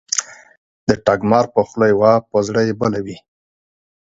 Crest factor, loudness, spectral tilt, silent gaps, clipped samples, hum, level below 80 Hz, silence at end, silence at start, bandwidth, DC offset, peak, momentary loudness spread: 18 dB; -17 LUFS; -5 dB/octave; 0.57-0.87 s; under 0.1%; none; -50 dBFS; 0.95 s; 0.1 s; 8 kHz; under 0.1%; 0 dBFS; 8 LU